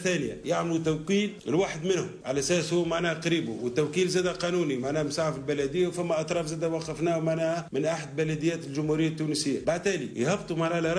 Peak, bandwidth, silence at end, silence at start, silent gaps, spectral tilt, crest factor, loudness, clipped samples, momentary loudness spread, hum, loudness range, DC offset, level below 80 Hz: -14 dBFS; 11 kHz; 0 s; 0 s; none; -5 dB/octave; 14 dB; -28 LUFS; under 0.1%; 4 LU; none; 1 LU; under 0.1%; -58 dBFS